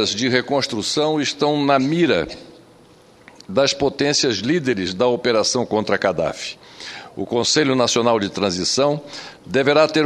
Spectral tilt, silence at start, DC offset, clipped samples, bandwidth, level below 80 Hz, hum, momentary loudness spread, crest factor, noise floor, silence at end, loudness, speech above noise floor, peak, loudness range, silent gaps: -3.5 dB/octave; 0 s; under 0.1%; under 0.1%; 13 kHz; -54 dBFS; none; 14 LU; 20 dB; -49 dBFS; 0 s; -19 LUFS; 30 dB; 0 dBFS; 2 LU; none